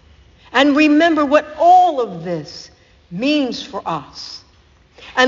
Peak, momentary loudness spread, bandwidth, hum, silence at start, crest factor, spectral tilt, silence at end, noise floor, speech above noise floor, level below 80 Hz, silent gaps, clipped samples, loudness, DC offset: 0 dBFS; 20 LU; 7.6 kHz; none; 0.55 s; 16 dB; -2.5 dB/octave; 0 s; -51 dBFS; 36 dB; -52 dBFS; none; under 0.1%; -15 LUFS; under 0.1%